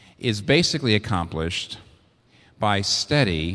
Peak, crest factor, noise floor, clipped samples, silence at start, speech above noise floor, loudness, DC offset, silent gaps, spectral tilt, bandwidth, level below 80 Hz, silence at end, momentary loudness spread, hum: -4 dBFS; 20 dB; -57 dBFS; under 0.1%; 0.2 s; 35 dB; -22 LUFS; under 0.1%; none; -4.5 dB/octave; 11 kHz; -44 dBFS; 0 s; 9 LU; none